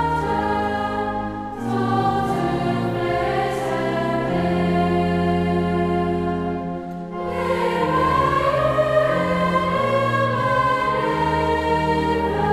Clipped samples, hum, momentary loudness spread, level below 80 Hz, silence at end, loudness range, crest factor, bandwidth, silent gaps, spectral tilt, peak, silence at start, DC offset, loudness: under 0.1%; none; 6 LU; -40 dBFS; 0 s; 3 LU; 14 dB; 13.5 kHz; none; -7 dB/octave; -6 dBFS; 0 s; under 0.1%; -21 LUFS